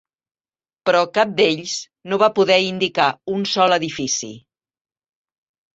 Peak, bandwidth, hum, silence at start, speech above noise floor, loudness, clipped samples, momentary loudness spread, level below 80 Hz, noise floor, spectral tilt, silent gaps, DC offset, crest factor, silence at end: -2 dBFS; 8 kHz; none; 0.85 s; over 72 dB; -18 LUFS; under 0.1%; 9 LU; -64 dBFS; under -90 dBFS; -3 dB/octave; none; under 0.1%; 18 dB; 1.35 s